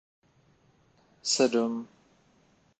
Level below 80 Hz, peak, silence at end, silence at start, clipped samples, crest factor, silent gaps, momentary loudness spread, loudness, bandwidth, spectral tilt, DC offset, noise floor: -78 dBFS; -10 dBFS; 0.95 s; 1.25 s; under 0.1%; 22 dB; none; 15 LU; -28 LUFS; 9 kHz; -2.5 dB/octave; under 0.1%; -65 dBFS